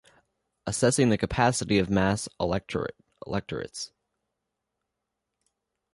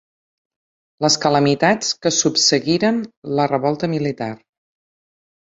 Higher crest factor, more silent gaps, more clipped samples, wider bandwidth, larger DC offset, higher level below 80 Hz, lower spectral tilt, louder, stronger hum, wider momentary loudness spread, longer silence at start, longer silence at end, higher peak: about the same, 20 dB vs 18 dB; second, none vs 3.17-3.22 s; neither; first, 11.5 kHz vs 8 kHz; neither; first, -50 dBFS vs -60 dBFS; first, -5 dB/octave vs -3.5 dB/octave; second, -27 LUFS vs -18 LUFS; neither; first, 15 LU vs 9 LU; second, 0.65 s vs 1 s; first, 2.05 s vs 1.2 s; second, -8 dBFS vs -2 dBFS